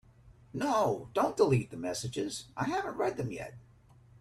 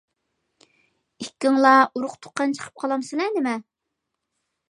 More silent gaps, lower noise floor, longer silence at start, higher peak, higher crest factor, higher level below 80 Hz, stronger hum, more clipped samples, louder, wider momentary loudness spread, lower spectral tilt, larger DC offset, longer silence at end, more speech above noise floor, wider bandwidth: neither; second, -59 dBFS vs -81 dBFS; second, 0.25 s vs 1.2 s; second, -12 dBFS vs -2 dBFS; about the same, 20 dB vs 22 dB; first, -62 dBFS vs -78 dBFS; neither; neither; second, -32 LUFS vs -22 LUFS; second, 11 LU vs 16 LU; first, -5.5 dB/octave vs -3.5 dB/octave; neither; second, 0.6 s vs 1.1 s; second, 28 dB vs 60 dB; first, 14 kHz vs 11.5 kHz